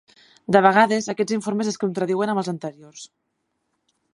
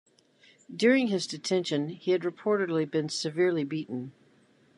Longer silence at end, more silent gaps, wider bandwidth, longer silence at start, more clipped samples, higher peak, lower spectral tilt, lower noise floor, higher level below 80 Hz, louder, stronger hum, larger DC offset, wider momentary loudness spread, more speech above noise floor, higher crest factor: first, 1.1 s vs 0.65 s; neither; about the same, 11.5 kHz vs 11.5 kHz; second, 0.5 s vs 0.7 s; neither; first, -2 dBFS vs -10 dBFS; about the same, -5 dB/octave vs -5 dB/octave; first, -75 dBFS vs -63 dBFS; first, -70 dBFS vs -80 dBFS; first, -21 LUFS vs -28 LUFS; neither; neither; first, 23 LU vs 12 LU; first, 54 dB vs 35 dB; about the same, 22 dB vs 20 dB